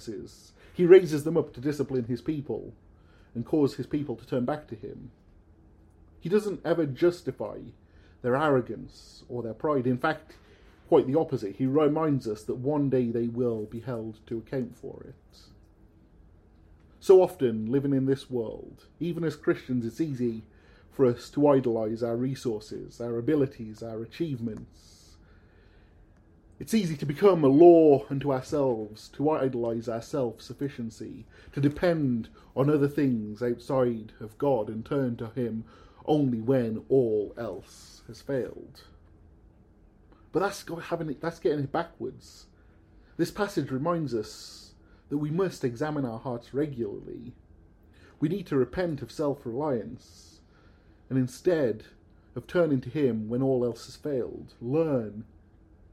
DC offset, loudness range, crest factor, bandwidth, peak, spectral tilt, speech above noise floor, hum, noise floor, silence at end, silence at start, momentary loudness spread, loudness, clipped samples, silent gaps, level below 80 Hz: under 0.1%; 10 LU; 24 dB; 14.5 kHz; -6 dBFS; -7.5 dB/octave; 30 dB; none; -57 dBFS; 0.7 s; 0 s; 16 LU; -28 LUFS; under 0.1%; none; -58 dBFS